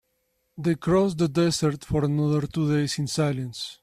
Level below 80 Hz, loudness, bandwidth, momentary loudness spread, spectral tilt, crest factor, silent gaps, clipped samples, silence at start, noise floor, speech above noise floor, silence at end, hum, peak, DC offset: -52 dBFS; -25 LUFS; 14 kHz; 5 LU; -6 dB/octave; 14 dB; none; under 0.1%; 0.55 s; -73 dBFS; 49 dB; 0.1 s; none; -10 dBFS; under 0.1%